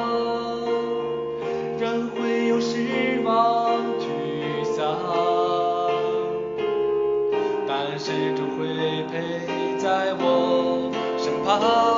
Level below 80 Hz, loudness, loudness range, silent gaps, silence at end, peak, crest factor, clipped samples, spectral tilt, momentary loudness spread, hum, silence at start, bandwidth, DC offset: -62 dBFS; -24 LUFS; 2 LU; none; 0 s; -8 dBFS; 16 dB; under 0.1%; -3.5 dB/octave; 7 LU; none; 0 s; 7.4 kHz; under 0.1%